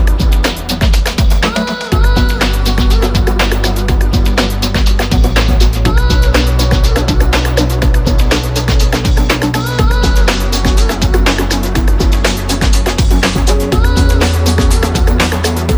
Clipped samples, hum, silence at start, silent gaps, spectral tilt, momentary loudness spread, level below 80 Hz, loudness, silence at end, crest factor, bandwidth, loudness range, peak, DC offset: under 0.1%; none; 0 s; none; -5 dB/octave; 3 LU; -12 dBFS; -12 LUFS; 0 s; 10 dB; over 20 kHz; 1 LU; 0 dBFS; under 0.1%